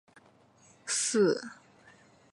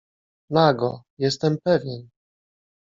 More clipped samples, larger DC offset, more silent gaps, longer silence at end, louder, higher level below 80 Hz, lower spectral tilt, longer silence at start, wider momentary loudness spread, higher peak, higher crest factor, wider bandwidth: neither; neither; second, none vs 1.10-1.17 s; about the same, 0.8 s vs 0.85 s; second, -29 LUFS vs -22 LUFS; second, -80 dBFS vs -64 dBFS; second, -3 dB/octave vs -5 dB/octave; first, 0.85 s vs 0.5 s; first, 20 LU vs 11 LU; second, -16 dBFS vs -4 dBFS; about the same, 18 dB vs 20 dB; first, 11.5 kHz vs 7.6 kHz